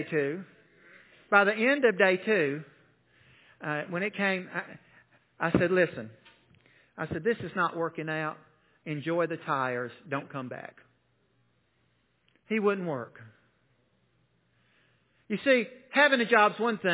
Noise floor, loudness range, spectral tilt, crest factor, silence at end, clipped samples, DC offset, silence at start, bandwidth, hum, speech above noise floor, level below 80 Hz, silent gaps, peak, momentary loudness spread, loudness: -71 dBFS; 9 LU; -3.5 dB/octave; 24 dB; 0 s; under 0.1%; under 0.1%; 0 s; 4 kHz; none; 43 dB; -64 dBFS; none; -6 dBFS; 17 LU; -28 LUFS